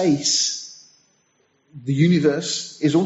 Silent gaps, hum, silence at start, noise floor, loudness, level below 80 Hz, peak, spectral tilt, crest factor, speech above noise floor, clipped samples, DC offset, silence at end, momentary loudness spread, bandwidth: none; none; 0 s; -64 dBFS; -20 LUFS; -62 dBFS; -4 dBFS; -4.5 dB/octave; 16 dB; 45 dB; under 0.1%; under 0.1%; 0 s; 15 LU; 8.2 kHz